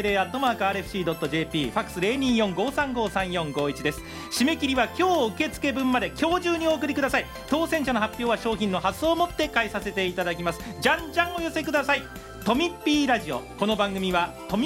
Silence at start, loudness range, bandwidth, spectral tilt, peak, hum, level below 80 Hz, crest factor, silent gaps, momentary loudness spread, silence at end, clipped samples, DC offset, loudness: 0 s; 1 LU; 16 kHz; -4.5 dB/octave; -6 dBFS; none; -48 dBFS; 20 dB; none; 5 LU; 0 s; under 0.1%; under 0.1%; -25 LUFS